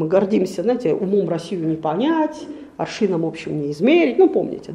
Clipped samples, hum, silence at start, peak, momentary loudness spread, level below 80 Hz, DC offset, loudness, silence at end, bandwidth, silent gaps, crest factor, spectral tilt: under 0.1%; none; 0 s; -4 dBFS; 10 LU; -60 dBFS; under 0.1%; -19 LUFS; 0 s; 11 kHz; none; 16 dB; -7 dB/octave